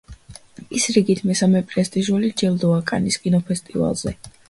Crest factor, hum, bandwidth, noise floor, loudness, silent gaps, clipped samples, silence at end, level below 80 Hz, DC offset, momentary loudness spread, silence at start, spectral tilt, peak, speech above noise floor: 18 dB; none; 11.5 kHz; -42 dBFS; -20 LUFS; none; under 0.1%; 0.2 s; -48 dBFS; under 0.1%; 6 LU; 0.1 s; -5 dB/octave; -4 dBFS; 23 dB